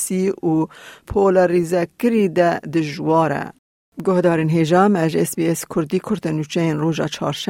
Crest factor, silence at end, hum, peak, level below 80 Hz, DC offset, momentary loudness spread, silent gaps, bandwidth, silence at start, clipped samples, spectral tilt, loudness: 16 dB; 0.05 s; none; -4 dBFS; -50 dBFS; under 0.1%; 8 LU; 3.59-3.92 s; 16.5 kHz; 0 s; under 0.1%; -6 dB/octave; -19 LUFS